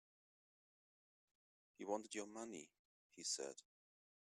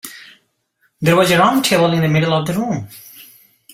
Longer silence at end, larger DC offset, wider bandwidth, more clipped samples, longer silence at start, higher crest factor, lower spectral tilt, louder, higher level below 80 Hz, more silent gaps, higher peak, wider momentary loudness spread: first, 0.65 s vs 0.5 s; neither; second, 13.5 kHz vs 16 kHz; neither; first, 1.8 s vs 0.05 s; first, 24 dB vs 16 dB; second, -1.5 dB/octave vs -5 dB/octave; second, -49 LUFS vs -15 LUFS; second, under -90 dBFS vs -52 dBFS; first, 2.79-3.10 s vs none; second, -28 dBFS vs -2 dBFS; about the same, 17 LU vs 19 LU